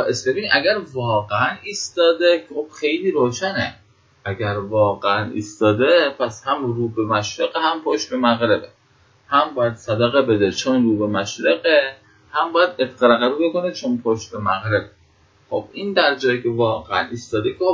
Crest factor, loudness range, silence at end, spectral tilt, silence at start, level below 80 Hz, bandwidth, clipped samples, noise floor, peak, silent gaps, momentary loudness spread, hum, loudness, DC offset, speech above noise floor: 20 dB; 3 LU; 0 s; -5 dB/octave; 0 s; -54 dBFS; 7.8 kHz; under 0.1%; -56 dBFS; 0 dBFS; none; 8 LU; none; -19 LUFS; under 0.1%; 37 dB